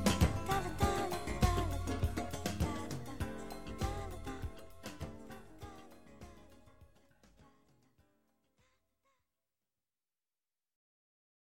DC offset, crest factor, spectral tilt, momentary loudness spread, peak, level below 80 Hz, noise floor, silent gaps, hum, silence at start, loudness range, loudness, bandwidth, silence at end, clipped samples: under 0.1%; 26 dB; -5.5 dB/octave; 20 LU; -14 dBFS; -46 dBFS; under -90 dBFS; none; none; 0 s; 21 LU; -38 LUFS; 16.5 kHz; 0.85 s; under 0.1%